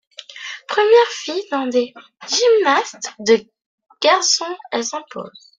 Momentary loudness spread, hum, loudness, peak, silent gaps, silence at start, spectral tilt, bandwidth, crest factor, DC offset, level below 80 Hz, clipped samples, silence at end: 18 LU; none; -17 LUFS; -2 dBFS; 3.66-3.78 s; 0.2 s; -1 dB/octave; 9.4 kHz; 18 dB; under 0.1%; -70 dBFS; under 0.1%; 0.3 s